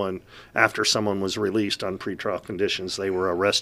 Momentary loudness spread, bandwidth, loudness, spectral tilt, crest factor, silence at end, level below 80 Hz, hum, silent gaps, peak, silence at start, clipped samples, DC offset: 9 LU; 15.5 kHz; -24 LUFS; -3.5 dB/octave; 24 dB; 0 s; -60 dBFS; none; none; -2 dBFS; 0 s; under 0.1%; under 0.1%